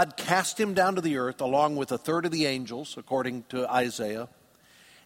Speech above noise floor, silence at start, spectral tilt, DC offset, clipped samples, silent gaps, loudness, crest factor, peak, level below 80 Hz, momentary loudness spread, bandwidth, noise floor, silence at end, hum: 30 dB; 0 s; -4 dB/octave; under 0.1%; under 0.1%; none; -28 LUFS; 22 dB; -8 dBFS; -68 dBFS; 9 LU; 16.5 kHz; -58 dBFS; 0.8 s; none